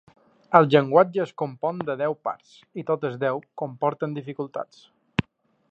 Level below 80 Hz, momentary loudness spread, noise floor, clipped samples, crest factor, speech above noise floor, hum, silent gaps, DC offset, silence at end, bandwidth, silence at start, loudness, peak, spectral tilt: -60 dBFS; 17 LU; -55 dBFS; under 0.1%; 24 dB; 31 dB; none; none; under 0.1%; 0.5 s; 8 kHz; 0.5 s; -24 LUFS; -2 dBFS; -8 dB/octave